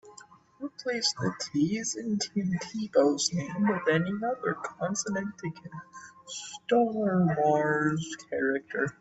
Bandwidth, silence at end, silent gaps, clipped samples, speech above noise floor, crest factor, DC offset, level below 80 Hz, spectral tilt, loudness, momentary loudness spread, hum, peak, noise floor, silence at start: 8.4 kHz; 0.1 s; none; under 0.1%; 25 dB; 18 dB; under 0.1%; -68 dBFS; -4.5 dB/octave; -29 LUFS; 14 LU; none; -12 dBFS; -54 dBFS; 0.05 s